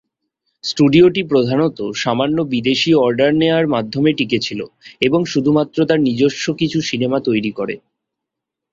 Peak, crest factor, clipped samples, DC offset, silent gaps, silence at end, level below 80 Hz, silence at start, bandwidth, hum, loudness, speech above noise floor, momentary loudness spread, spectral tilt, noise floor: 0 dBFS; 16 dB; under 0.1%; under 0.1%; none; 0.95 s; -54 dBFS; 0.65 s; 7.6 kHz; none; -16 LUFS; 66 dB; 10 LU; -5.5 dB/octave; -82 dBFS